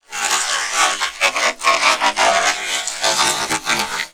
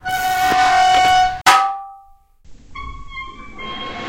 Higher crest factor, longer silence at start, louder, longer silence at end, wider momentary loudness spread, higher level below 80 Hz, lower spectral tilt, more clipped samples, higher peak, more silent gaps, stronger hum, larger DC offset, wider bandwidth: about the same, 18 dB vs 18 dB; about the same, 0.1 s vs 0.05 s; about the same, -16 LUFS vs -14 LUFS; about the same, 0.05 s vs 0 s; second, 4 LU vs 21 LU; second, -52 dBFS vs -40 dBFS; second, 0.5 dB/octave vs -1.5 dB/octave; neither; about the same, 0 dBFS vs 0 dBFS; neither; neither; first, 0.2% vs under 0.1%; first, 19.5 kHz vs 16.5 kHz